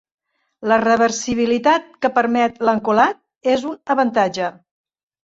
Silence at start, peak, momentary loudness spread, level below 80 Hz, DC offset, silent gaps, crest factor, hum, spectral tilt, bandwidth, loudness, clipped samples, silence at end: 0.6 s; -2 dBFS; 6 LU; -58 dBFS; under 0.1%; 3.37-3.41 s; 16 dB; none; -4 dB/octave; 8 kHz; -18 LUFS; under 0.1%; 0.75 s